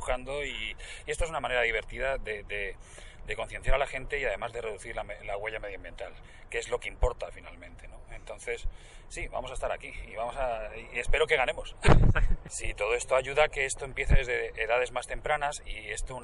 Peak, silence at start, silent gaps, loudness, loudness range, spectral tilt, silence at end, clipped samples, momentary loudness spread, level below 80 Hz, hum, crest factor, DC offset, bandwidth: -8 dBFS; 0 s; none; -31 LUFS; 10 LU; -4.5 dB/octave; 0 s; under 0.1%; 16 LU; -34 dBFS; none; 22 dB; under 0.1%; 11.5 kHz